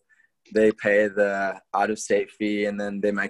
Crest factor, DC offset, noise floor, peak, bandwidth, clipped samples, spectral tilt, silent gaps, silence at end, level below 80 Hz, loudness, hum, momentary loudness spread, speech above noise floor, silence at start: 16 dB; under 0.1%; -61 dBFS; -8 dBFS; 11.5 kHz; under 0.1%; -5 dB/octave; none; 0 s; -62 dBFS; -24 LUFS; none; 7 LU; 38 dB; 0.5 s